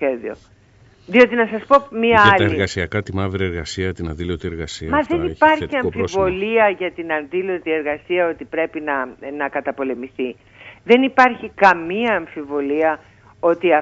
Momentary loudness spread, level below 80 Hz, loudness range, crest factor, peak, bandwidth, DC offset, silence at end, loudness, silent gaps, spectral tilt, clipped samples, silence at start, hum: 12 LU; -44 dBFS; 6 LU; 18 dB; 0 dBFS; 8 kHz; under 0.1%; 0 s; -18 LUFS; none; -6 dB/octave; under 0.1%; 0 s; none